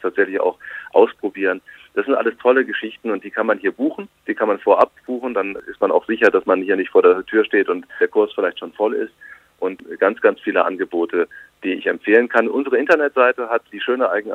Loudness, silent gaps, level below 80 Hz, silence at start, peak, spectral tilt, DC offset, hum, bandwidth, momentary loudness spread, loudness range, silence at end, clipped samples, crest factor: -19 LUFS; none; -66 dBFS; 0.05 s; 0 dBFS; -6 dB/octave; under 0.1%; 50 Hz at -75 dBFS; 6.6 kHz; 11 LU; 3 LU; 0 s; under 0.1%; 18 dB